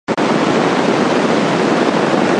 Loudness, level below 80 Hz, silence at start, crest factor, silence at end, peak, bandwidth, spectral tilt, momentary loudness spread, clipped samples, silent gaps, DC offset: -14 LUFS; -54 dBFS; 0.1 s; 12 dB; 0 s; -2 dBFS; 11 kHz; -5.5 dB/octave; 1 LU; under 0.1%; none; under 0.1%